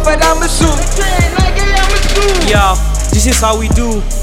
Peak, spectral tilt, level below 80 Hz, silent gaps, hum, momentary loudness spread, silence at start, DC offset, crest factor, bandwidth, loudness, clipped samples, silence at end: 0 dBFS; -4 dB/octave; -12 dBFS; none; none; 4 LU; 0 s; under 0.1%; 10 dB; 16 kHz; -12 LUFS; under 0.1%; 0 s